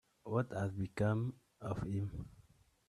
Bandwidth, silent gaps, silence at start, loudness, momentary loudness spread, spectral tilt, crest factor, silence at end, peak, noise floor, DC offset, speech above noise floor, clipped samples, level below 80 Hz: 11.5 kHz; none; 0.25 s; -40 LUFS; 12 LU; -8.5 dB/octave; 18 dB; 0.5 s; -22 dBFS; -67 dBFS; under 0.1%; 29 dB; under 0.1%; -60 dBFS